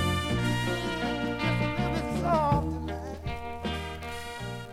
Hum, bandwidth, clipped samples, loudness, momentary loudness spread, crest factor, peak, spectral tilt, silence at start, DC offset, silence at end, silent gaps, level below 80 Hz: none; 16 kHz; under 0.1%; -30 LUFS; 11 LU; 18 dB; -12 dBFS; -6 dB/octave; 0 s; under 0.1%; 0 s; none; -42 dBFS